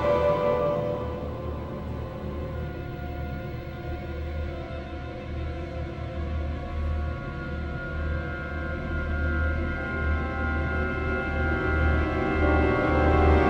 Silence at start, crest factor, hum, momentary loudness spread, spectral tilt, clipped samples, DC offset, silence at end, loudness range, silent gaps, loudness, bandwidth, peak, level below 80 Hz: 0 s; 18 dB; none; 12 LU; -8.5 dB/octave; under 0.1%; under 0.1%; 0 s; 9 LU; none; -28 LUFS; 6 kHz; -8 dBFS; -32 dBFS